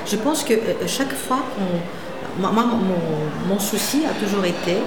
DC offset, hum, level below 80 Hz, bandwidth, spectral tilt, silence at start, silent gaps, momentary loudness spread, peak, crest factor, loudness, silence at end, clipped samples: 2%; none; -54 dBFS; 19 kHz; -4.5 dB/octave; 0 s; none; 5 LU; -6 dBFS; 16 dB; -22 LUFS; 0 s; under 0.1%